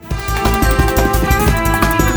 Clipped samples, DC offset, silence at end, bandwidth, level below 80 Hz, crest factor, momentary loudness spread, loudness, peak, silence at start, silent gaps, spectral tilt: under 0.1%; under 0.1%; 0 s; over 20 kHz; -18 dBFS; 14 dB; 3 LU; -14 LUFS; 0 dBFS; 0 s; none; -5 dB/octave